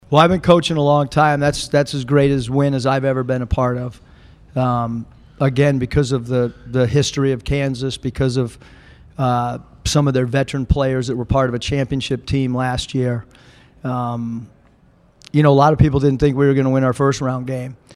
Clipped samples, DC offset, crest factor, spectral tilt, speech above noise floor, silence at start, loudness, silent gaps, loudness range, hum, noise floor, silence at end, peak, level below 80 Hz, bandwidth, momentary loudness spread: under 0.1%; under 0.1%; 18 dB; -6.5 dB/octave; 35 dB; 0.1 s; -18 LUFS; none; 5 LU; none; -52 dBFS; 0 s; 0 dBFS; -36 dBFS; 11.5 kHz; 11 LU